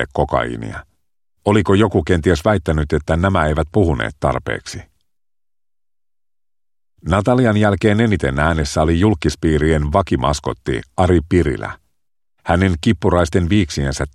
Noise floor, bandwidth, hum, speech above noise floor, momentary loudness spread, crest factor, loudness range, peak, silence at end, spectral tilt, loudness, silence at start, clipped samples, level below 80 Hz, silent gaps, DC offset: under -90 dBFS; 12.5 kHz; none; over 74 dB; 10 LU; 16 dB; 6 LU; 0 dBFS; 0.05 s; -6.5 dB/octave; -17 LUFS; 0 s; under 0.1%; -30 dBFS; none; under 0.1%